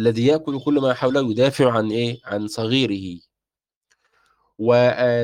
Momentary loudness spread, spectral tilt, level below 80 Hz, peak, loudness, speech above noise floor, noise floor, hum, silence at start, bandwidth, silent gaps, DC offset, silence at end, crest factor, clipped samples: 10 LU; -6.5 dB/octave; -60 dBFS; -4 dBFS; -20 LUFS; over 71 dB; under -90 dBFS; none; 0 s; 15 kHz; 3.76-3.81 s; under 0.1%; 0 s; 16 dB; under 0.1%